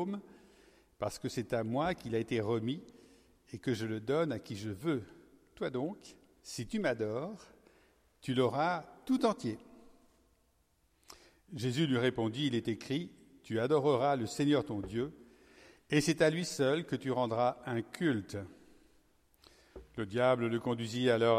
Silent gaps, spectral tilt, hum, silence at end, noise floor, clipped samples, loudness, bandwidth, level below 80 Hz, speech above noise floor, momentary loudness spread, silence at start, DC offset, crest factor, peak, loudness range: none; -5.5 dB/octave; none; 0 s; -73 dBFS; under 0.1%; -34 LUFS; 15.5 kHz; -66 dBFS; 40 dB; 14 LU; 0 s; under 0.1%; 20 dB; -14 dBFS; 5 LU